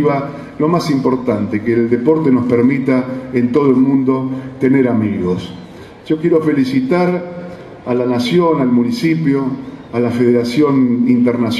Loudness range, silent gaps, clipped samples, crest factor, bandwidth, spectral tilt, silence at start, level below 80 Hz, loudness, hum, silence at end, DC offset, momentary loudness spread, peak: 2 LU; none; under 0.1%; 14 dB; 12.5 kHz; -7.5 dB/octave; 0 s; -50 dBFS; -14 LUFS; none; 0 s; under 0.1%; 10 LU; 0 dBFS